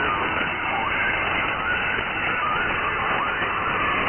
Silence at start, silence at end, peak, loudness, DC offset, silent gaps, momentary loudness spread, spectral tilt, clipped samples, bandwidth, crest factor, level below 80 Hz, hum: 0 s; 0 s; -12 dBFS; -22 LUFS; under 0.1%; none; 2 LU; 1 dB/octave; under 0.1%; 3.4 kHz; 12 dB; -44 dBFS; none